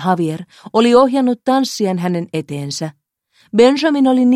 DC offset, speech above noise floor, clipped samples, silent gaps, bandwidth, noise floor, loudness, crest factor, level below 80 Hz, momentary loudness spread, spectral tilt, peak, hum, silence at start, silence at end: under 0.1%; 43 dB; under 0.1%; none; 13.5 kHz; -57 dBFS; -15 LUFS; 14 dB; -60 dBFS; 12 LU; -5.5 dB/octave; 0 dBFS; none; 0 s; 0 s